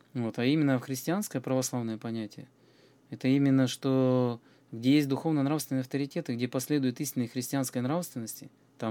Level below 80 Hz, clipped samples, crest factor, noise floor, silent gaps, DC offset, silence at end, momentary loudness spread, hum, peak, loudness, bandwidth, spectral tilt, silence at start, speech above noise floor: -84 dBFS; under 0.1%; 16 dB; -61 dBFS; none; under 0.1%; 0 s; 12 LU; none; -14 dBFS; -30 LUFS; 18.5 kHz; -6 dB/octave; 0.15 s; 32 dB